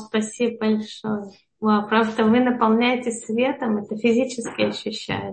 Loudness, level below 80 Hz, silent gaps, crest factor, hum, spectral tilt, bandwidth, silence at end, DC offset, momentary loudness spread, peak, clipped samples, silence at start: -22 LUFS; -62 dBFS; none; 18 dB; none; -5 dB/octave; 8.8 kHz; 0 s; under 0.1%; 10 LU; -4 dBFS; under 0.1%; 0 s